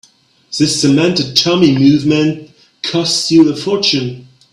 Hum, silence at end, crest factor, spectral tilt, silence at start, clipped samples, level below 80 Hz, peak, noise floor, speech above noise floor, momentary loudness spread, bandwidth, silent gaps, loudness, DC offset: none; 0.3 s; 14 dB; -4.5 dB/octave; 0.5 s; under 0.1%; -52 dBFS; 0 dBFS; -47 dBFS; 35 dB; 10 LU; 13 kHz; none; -12 LUFS; under 0.1%